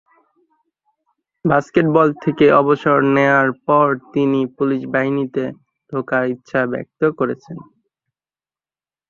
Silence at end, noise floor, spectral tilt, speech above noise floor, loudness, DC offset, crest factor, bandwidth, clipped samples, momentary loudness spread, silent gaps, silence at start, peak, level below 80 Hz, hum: 1.5 s; under -90 dBFS; -8 dB/octave; over 74 dB; -17 LUFS; under 0.1%; 18 dB; 7.2 kHz; under 0.1%; 11 LU; none; 1.45 s; -2 dBFS; -58 dBFS; none